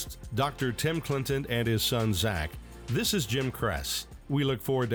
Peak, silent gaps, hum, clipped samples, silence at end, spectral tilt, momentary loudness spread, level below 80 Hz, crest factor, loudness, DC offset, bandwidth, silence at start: -16 dBFS; none; none; under 0.1%; 0 s; -4.5 dB/octave; 7 LU; -46 dBFS; 14 dB; -29 LUFS; under 0.1%; 19.5 kHz; 0 s